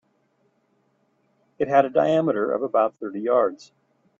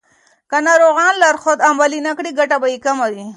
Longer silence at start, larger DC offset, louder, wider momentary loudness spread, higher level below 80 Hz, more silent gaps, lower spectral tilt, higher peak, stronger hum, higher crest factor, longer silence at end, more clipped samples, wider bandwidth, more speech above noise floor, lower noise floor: first, 1.6 s vs 0.5 s; neither; second, -22 LUFS vs -14 LUFS; about the same, 7 LU vs 9 LU; about the same, -70 dBFS vs -70 dBFS; neither; first, -7.5 dB/octave vs -2 dB/octave; second, -4 dBFS vs 0 dBFS; neither; first, 20 dB vs 14 dB; first, 0.65 s vs 0 s; neither; second, 7.4 kHz vs 11.5 kHz; first, 46 dB vs 42 dB; first, -67 dBFS vs -56 dBFS